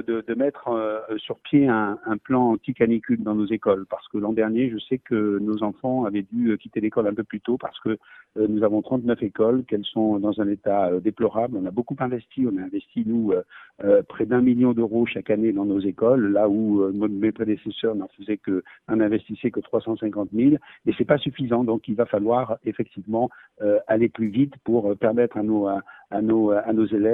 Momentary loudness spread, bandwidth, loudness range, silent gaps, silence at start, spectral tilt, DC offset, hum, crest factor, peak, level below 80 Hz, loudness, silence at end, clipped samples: 8 LU; 4 kHz; 3 LU; none; 0 s; -10.5 dB/octave; under 0.1%; none; 18 dB; -6 dBFS; -60 dBFS; -23 LUFS; 0 s; under 0.1%